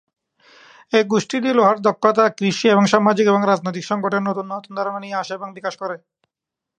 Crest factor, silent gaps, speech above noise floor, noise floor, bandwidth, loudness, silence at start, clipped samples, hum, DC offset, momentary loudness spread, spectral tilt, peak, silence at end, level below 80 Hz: 20 dB; none; 67 dB; -85 dBFS; 9.6 kHz; -18 LUFS; 0.9 s; under 0.1%; none; under 0.1%; 13 LU; -5.5 dB/octave; 0 dBFS; 0.8 s; -70 dBFS